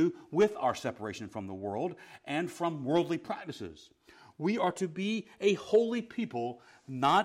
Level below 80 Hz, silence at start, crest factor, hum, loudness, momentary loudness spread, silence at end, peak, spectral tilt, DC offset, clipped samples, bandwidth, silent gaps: -72 dBFS; 0 s; 18 dB; none; -32 LUFS; 13 LU; 0 s; -14 dBFS; -5.5 dB/octave; under 0.1%; under 0.1%; 14 kHz; none